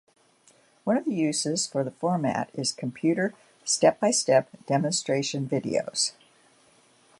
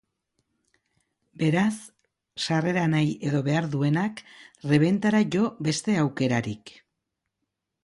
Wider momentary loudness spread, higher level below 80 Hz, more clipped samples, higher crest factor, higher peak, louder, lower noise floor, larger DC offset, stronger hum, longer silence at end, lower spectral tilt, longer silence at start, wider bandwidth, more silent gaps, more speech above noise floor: second, 7 LU vs 13 LU; second, -72 dBFS vs -64 dBFS; neither; about the same, 22 dB vs 20 dB; about the same, -6 dBFS vs -8 dBFS; about the same, -26 LUFS vs -25 LUFS; second, -61 dBFS vs -82 dBFS; neither; neither; about the same, 1.1 s vs 1.15 s; second, -4 dB/octave vs -6 dB/octave; second, 0.85 s vs 1.4 s; about the same, 11.5 kHz vs 11.5 kHz; neither; second, 35 dB vs 58 dB